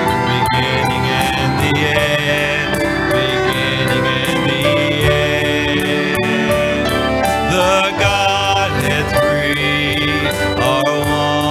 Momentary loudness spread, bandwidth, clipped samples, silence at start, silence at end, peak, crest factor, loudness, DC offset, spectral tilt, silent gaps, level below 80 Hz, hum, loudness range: 2 LU; 17 kHz; under 0.1%; 0 s; 0 s; 0 dBFS; 16 dB; -15 LUFS; under 0.1%; -4.5 dB/octave; none; -34 dBFS; none; 1 LU